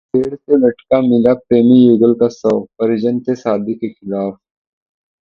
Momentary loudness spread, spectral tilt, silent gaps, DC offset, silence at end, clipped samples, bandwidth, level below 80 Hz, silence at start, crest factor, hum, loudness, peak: 13 LU; -8.5 dB/octave; none; under 0.1%; 0.9 s; under 0.1%; 6.8 kHz; -54 dBFS; 0.15 s; 14 dB; none; -14 LUFS; 0 dBFS